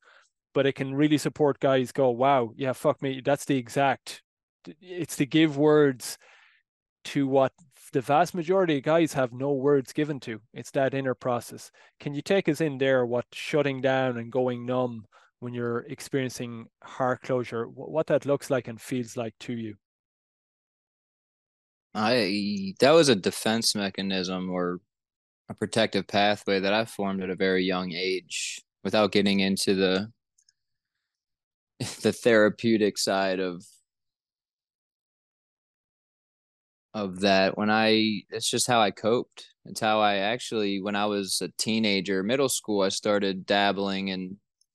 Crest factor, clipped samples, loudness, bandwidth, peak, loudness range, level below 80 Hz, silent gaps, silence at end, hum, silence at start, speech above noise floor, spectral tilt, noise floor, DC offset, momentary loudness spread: 20 dB; under 0.1%; -26 LUFS; 12.5 kHz; -6 dBFS; 6 LU; -72 dBFS; 4.24-4.37 s, 4.43-4.60 s, 6.69-6.96 s, 19.85-21.90 s, 25.16-25.45 s, 31.44-31.67 s, 34.53-34.57 s, 34.75-36.89 s; 0.4 s; none; 0.55 s; over 64 dB; -4.5 dB/octave; under -90 dBFS; under 0.1%; 13 LU